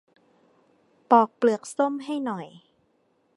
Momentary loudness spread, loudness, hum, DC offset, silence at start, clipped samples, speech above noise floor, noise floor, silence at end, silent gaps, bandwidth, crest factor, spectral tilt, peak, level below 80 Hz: 14 LU; -24 LUFS; none; under 0.1%; 1.1 s; under 0.1%; 44 dB; -68 dBFS; 0.9 s; none; 11.5 kHz; 22 dB; -5.5 dB/octave; -4 dBFS; -82 dBFS